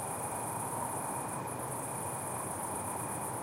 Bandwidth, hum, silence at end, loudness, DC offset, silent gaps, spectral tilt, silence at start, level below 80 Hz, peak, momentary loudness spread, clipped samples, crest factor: 16 kHz; none; 0 s; -37 LUFS; under 0.1%; none; -4 dB/octave; 0 s; -66 dBFS; -22 dBFS; 2 LU; under 0.1%; 14 dB